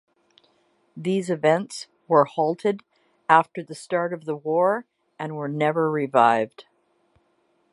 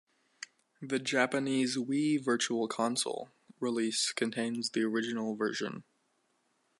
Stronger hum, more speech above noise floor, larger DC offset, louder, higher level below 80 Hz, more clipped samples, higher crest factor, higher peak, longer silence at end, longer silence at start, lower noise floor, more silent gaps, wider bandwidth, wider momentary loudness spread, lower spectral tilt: neither; about the same, 45 dB vs 43 dB; neither; first, -23 LUFS vs -32 LUFS; first, -78 dBFS vs -84 dBFS; neither; about the same, 22 dB vs 20 dB; first, -2 dBFS vs -12 dBFS; about the same, 1.1 s vs 1 s; first, 0.95 s vs 0.4 s; second, -67 dBFS vs -75 dBFS; neither; about the same, 11.5 kHz vs 11.5 kHz; second, 15 LU vs 18 LU; first, -6 dB/octave vs -3.5 dB/octave